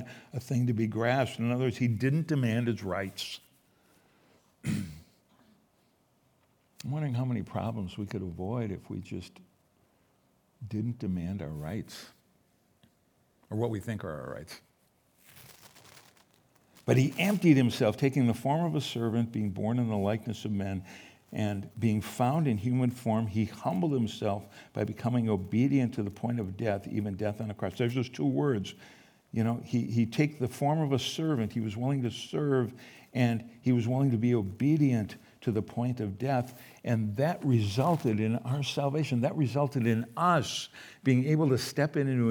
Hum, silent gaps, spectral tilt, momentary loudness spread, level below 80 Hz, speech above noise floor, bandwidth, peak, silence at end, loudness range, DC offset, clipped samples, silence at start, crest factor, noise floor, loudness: none; none; -7 dB/octave; 13 LU; -68 dBFS; 40 dB; over 20 kHz; -10 dBFS; 0 s; 11 LU; under 0.1%; under 0.1%; 0 s; 20 dB; -69 dBFS; -30 LUFS